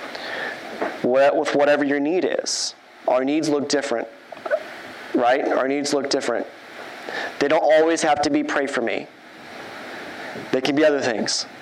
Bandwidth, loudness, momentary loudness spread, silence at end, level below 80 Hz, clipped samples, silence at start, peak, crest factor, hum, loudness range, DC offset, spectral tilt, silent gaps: 13 kHz; -21 LUFS; 17 LU; 0 s; -66 dBFS; under 0.1%; 0 s; -6 dBFS; 16 dB; none; 3 LU; under 0.1%; -3 dB/octave; none